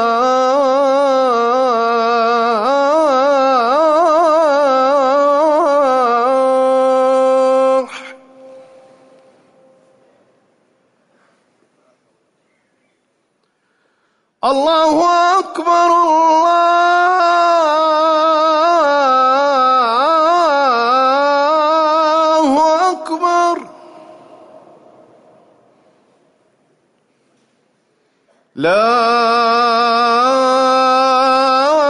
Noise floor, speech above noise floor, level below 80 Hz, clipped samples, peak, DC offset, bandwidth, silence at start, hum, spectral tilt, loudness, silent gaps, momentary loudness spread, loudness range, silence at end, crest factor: -64 dBFS; 53 dB; -62 dBFS; under 0.1%; -4 dBFS; under 0.1%; 11 kHz; 0 s; none; -3 dB/octave; -12 LUFS; none; 3 LU; 8 LU; 0 s; 10 dB